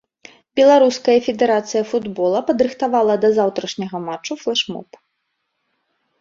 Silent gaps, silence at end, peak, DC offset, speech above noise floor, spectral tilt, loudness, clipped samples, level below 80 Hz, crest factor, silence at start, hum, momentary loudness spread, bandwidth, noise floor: none; 1.35 s; -2 dBFS; under 0.1%; 56 dB; -4.5 dB/octave; -17 LUFS; under 0.1%; -62 dBFS; 16 dB; 0.55 s; none; 13 LU; 7.6 kHz; -73 dBFS